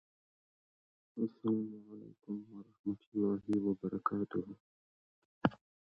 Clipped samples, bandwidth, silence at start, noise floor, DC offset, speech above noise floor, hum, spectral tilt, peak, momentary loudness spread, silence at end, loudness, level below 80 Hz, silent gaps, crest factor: under 0.1%; 5.4 kHz; 1.15 s; under -90 dBFS; under 0.1%; over 52 dB; none; -7.5 dB/octave; -12 dBFS; 17 LU; 0.4 s; -38 LUFS; -72 dBFS; 2.79-2.84 s, 3.06-3.12 s, 4.60-5.41 s; 28 dB